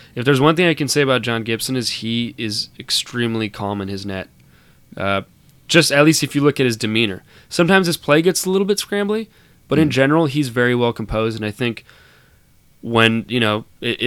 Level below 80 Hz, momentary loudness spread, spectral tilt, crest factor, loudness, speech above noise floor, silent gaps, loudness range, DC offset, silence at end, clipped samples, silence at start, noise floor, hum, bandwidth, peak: -48 dBFS; 11 LU; -4.5 dB/octave; 18 dB; -18 LUFS; 35 dB; none; 6 LU; under 0.1%; 0 s; under 0.1%; 0.15 s; -52 dBFS; none; 17.5 kHz; 0 dBFS